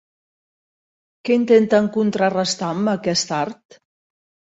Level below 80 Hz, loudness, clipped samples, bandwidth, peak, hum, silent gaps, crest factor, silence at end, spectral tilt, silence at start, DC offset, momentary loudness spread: -64 dBFS; -19 LUFS; under 0.1%; 8 kHz; -2 dBFS; none; none; 18 dB; 1.05 s; -4.5 dB/octave; 1.25 s; under 0.1%; 10 LU